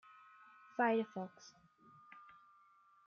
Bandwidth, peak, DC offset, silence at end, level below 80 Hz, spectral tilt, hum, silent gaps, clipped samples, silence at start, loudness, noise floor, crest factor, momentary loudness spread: 7 kHz; -24 dBFS; under 0.1%; 0.85 s; under -90 dBFS; -4 dB/octave; none; none; under 0.1%; 0.8 s; -39 LUFS; -68 dBFS; 20 dB; 26 LU